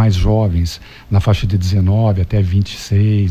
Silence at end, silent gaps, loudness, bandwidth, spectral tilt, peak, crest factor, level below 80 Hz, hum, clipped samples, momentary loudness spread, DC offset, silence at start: 0 s; none; -15 LUFS; 13.5 kHz; -7.5 dB/octave; -4 dBFS; 10 dB; -24 dBFS; none; under 0.1%; 5 LU; under 0.1%; 0 s